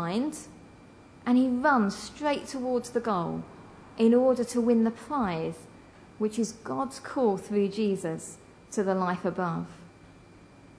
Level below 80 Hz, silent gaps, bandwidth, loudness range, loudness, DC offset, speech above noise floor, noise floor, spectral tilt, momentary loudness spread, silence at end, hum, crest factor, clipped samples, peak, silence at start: -62 dBFS; none; 11 kHz; 4 LU; -28 LUFS; under 0.1%; 26 dB; -53 dBFS; -6 dB/octave; 14 LU; 0.7 s; none; 18 dB; under 0.1%; -10 dBFS; 0 s